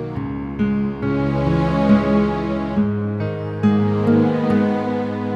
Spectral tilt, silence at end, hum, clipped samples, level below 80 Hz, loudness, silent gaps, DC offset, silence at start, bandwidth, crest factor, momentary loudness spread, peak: -9 dB/octave; 0 s; none; under 0.1%; -38 dBFS; -19 LUFS; none; under 0.1%; 0 s; 6.6 kHz; 14 dB; 8 LU; -4 dBFS